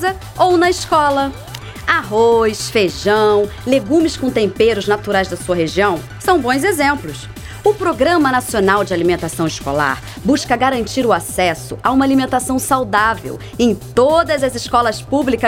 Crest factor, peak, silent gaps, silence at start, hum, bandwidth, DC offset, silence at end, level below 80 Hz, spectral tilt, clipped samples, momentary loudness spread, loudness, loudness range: 16 dB; 0 dBFS; none; 0 s; none; 17 kHz; under 0.1%; 0 s; -38 dBFS; -4.5 dB/octave; under 0.1%; 7 LU; -15 LUFS; 2 LU